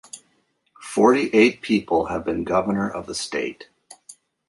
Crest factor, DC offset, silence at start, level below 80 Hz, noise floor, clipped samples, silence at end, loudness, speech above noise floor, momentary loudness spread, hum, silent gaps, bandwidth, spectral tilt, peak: 20 dB; under 0.1%; 0.15 s; -54 dBFS; -67 dBFS; under 0.1%; 0.35 s; -21 LUFS; 46 dB; 14 LU; none; none; 11.5 kHz; -5 dB/octave; -2 dBFS